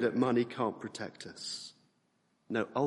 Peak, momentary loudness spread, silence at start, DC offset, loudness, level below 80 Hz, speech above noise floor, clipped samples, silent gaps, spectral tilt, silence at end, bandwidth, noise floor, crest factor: -16 dBFS; 13 LU; 0 s; under 0.1%; -35 LUFS; -78 dBFS; 41 dB; under 0.1%; none; -5 dB/octave; 0 s; 11.5 kHz; -75 dBFS; 20 dB